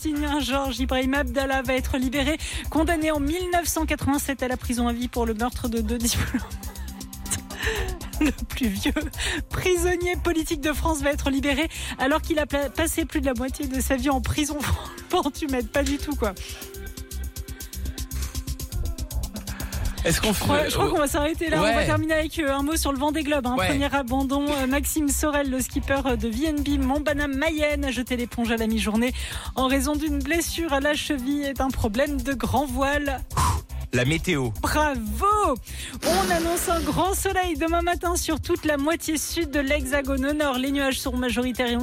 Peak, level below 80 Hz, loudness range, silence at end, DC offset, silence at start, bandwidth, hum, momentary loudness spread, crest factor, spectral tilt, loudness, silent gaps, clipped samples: -10 dBFS; -34 dBFS; 4 LU; 0 s; under 0.1%; 0 s; 17 kHz; none; 8 LU; 14 dB; -4.5 dB/octave; -24 LUFS; none; under 0.1%